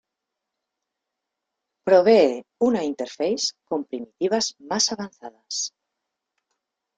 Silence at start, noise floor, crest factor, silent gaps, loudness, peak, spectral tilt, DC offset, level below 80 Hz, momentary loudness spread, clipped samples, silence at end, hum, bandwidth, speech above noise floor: 1.85 s; -84 dBFS; 20 dB; none; -22 LUFS; -4 dBFS; -3 dB/octave; under 0.1%; -70 dBFS; 14 LU; under 0.1%; 1.3 s; none; 9.4 kHz; 62 dB